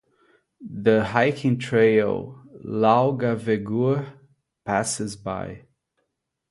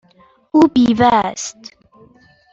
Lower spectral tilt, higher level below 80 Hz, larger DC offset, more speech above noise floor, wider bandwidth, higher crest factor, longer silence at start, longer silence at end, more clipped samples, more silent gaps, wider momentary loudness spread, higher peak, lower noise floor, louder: about the same, -6 dB/octave vs -5 dB/octave; second, -58 dBFS vs -50 dBFS; neither; first, 56 dB vs 38 dB; first, 11.5 kHz vs 8 kHz; about the same, 20 dB vs 16 dB; about the same, 0.6 s vs 0.55 s; about the same, 0.9 s vs 1 s; neither; neither; first, 19 LU vs 14 LU; about the same, -4 dBFS vs -2 dBFS; first, -78 dBFS vs -52 dBFS; second, -22 LUFS vs -14 LUFS